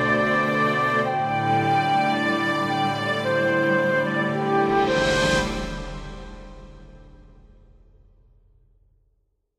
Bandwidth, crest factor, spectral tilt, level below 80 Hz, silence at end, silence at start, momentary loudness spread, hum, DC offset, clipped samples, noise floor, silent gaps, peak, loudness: 14.5 kHz; 14 dB; -5 dB/octave; -44 dBFS; 2.35 s; 0 s; 13 LU; none; under 0.1%; under 0.1%; -69 dBFS; none; -8 dBFS; -22 LUFS